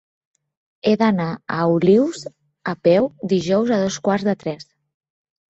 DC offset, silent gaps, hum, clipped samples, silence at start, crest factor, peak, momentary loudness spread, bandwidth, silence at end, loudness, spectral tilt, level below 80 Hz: under 0.1%; none; none; under 0.1%; 0.85 s; 16 dB; -4 dBFS; 14 LU; 8.2 kHz; 0.95 s; -19 LUFS; -6.5 dB/octave; -60 dBFS